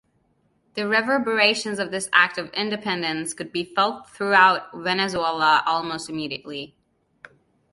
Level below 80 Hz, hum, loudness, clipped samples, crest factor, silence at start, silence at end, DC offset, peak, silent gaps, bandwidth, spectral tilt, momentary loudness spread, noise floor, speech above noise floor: -64 dBFS; none; -21 LUFS; under 0.1%; 22 dB; 0.75 s; 1.05 s; under 0.1%; -2 dBFS; none; 11.5 kHz; -3 dB/octave; 12 LU; -66 dBFS; 44 dB